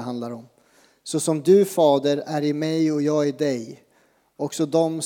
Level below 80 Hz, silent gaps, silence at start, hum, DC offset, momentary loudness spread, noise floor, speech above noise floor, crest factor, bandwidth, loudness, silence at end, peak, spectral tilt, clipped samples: -80 dBFS; none; 0 s; none; under 0.1%; 15 LU; -62 dBFS; 41 dB; 16 dB; 18.5 kHz; -22 LUFS; 0 s; -6 dBFS; -5.5 dB/octave; under 0.1%